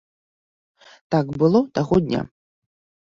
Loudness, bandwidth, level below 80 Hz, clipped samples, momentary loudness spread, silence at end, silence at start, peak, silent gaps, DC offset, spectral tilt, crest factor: -21 LUFS; 7.6 kHz; -50 dBFS; under 0.1%; 9 LU; 0.85 s; 1.1 s; -6 dBFS; none; under 0.1%; -8 dB/octave; 18 dB